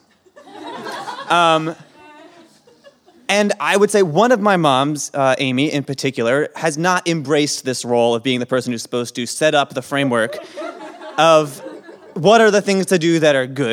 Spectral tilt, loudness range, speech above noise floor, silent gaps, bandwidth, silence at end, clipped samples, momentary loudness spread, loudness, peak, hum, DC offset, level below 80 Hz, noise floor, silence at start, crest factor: -4.5 dB/octave; 3 LU; 33 dB; none; 16 kHz; 0 s; under 0.1%; 16 LU; -16 LUFS; 0 dBFS; none; under 0.1%; -70 dBFS; -49 dBFS; 0.45 s; 16 dB